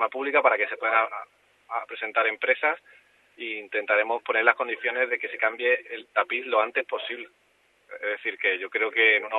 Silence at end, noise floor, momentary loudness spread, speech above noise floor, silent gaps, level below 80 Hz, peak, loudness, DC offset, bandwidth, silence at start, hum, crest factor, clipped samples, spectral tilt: 0 s; -63 dBFS; 13 LU; 38 dB; none; -86 dBFS; -2 dBFS; -25 LUFS; under 0.1%; 4.3 kHz; 0 s; 50 Hz at -85 dBFS; 24 dB; under 0.1%; -3 dB/octave